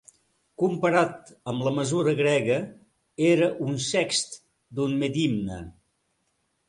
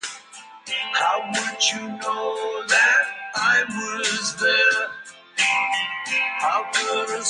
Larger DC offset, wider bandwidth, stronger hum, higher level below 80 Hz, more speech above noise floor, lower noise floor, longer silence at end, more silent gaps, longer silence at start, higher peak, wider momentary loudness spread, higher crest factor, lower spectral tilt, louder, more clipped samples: neither; about the same, 11.5 kHz vs 11.5 kHz; neither; first, -58 dBFS vs -74 dBFS; first, 49 dB vs 22 dB; first, -73 dBFS vs -44 dBFS; first, 1 s vs 0 s; neither; first, 0.6 s vs 0.05 s; about the same, -8 dBFS vs -6 dBFS; first, 16 LU vs 11 LU; about the same, 18 dB vs 18 dB; first, -5 dB/octave vs 0 dB/octave; second, -25 LUFS vs -21 LUFS; neither